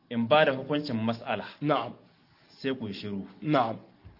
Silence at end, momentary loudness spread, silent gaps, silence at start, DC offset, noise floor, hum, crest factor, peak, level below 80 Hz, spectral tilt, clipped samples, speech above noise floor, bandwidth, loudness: 0.1 s; 14 LU; none; 0.1 s; under 0.1%; -60 dBFS; none; 22 dB; -8 dBFS; -70 dBFS; -8 dB/octave; under 0.1%; 31 dB; 5.8 kHz; -29 LUFS